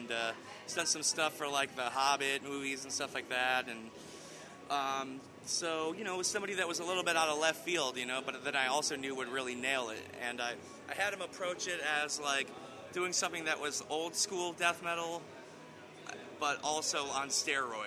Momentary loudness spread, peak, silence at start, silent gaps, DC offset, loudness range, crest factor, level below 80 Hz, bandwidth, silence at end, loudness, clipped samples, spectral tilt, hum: 15 LU; -14 dBFS; 0 s; none; under 0.1%; 3 LU; 22 dB; -80 dBFS; over 20 kHz; 0 s; -35 LUFS; under 0.1%; -1 dB/octave; none